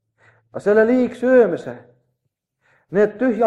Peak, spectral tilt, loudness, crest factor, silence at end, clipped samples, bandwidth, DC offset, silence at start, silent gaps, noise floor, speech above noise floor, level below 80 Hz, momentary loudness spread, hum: -4 dBFS; -7.5 dB/octave; -17 LUFS; 16 dB; 0 s; under 0.1%; 9 kHz; under 0.1%; 0.55 s; none; -75 dBFS; 59 dB; -62 dBFS; 14 LU; none